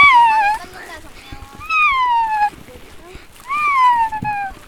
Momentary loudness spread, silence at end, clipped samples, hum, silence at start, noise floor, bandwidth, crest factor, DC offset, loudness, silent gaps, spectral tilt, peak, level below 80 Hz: 22 LU; 0.15 s; under 0.1%; none; 0 s; -38 dBFS; 16 kHz; 16 dB; under 0.1%; -15 LUFS; none; -2.5 dB/octave; 0 dBFS; -44 dBFS